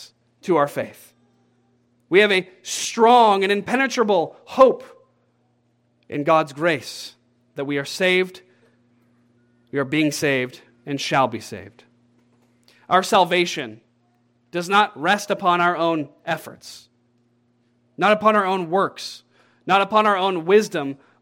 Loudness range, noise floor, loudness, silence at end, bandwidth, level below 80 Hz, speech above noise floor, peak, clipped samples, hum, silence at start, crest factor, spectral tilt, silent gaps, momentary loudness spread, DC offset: 6 LU; -65 dBFS; -20 LUFS; 0.25 s; 17 kHz; -70 dBFS; 45 dB; -2 dBFS; under 0.1%; none; 0 s; 20 dB; -4 dB/octave; none; 17 LU; under 0.1%